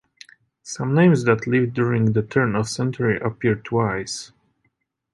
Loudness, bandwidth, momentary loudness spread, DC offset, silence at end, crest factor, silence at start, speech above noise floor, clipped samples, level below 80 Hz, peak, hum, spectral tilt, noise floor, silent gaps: -21 LUFS; 11.5 kHz; 13 LU; under 0.1%; 0.85 s; 18 dB; 0.65 s; 51 dB; under 0.1%; -54 dBFS; -4 dBFS; none; -6.5 dB/octave; -71 dBFS; none